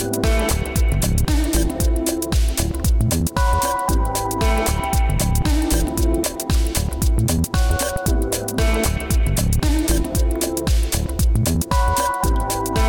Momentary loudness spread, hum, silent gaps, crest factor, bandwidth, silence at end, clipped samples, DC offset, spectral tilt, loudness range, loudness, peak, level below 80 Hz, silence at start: 2 LU; none; none; 10 dB; 19 kHz; 0 s; under 0.1%; under 0.1%; -5 dB/octave; 1 LU; -20 LUFS; -8 dBFS; -20 dBFS; 0 s